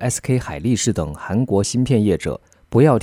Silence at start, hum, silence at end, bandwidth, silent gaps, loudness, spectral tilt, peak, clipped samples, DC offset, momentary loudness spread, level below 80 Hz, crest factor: 0 s; none; 0 s; 16 kHz; none; -19 LUFS; -6 dB/octave; -2 dBFS; under 0.1%; under 0.1%; 8 LU; -40 dBFS; 16 dB